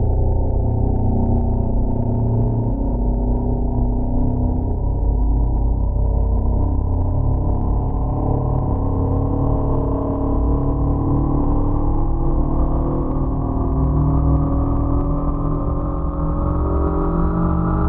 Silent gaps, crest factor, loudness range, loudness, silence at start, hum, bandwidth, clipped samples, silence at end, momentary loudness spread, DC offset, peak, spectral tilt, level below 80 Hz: none; 12 dB; 1 LU; -20 LUFS; 0 s; none; 2 kHz; under 0.1%; 0 s; 3 LU; under 0.1%; -6 dBFS; -15 dB/octave; -20 dBFS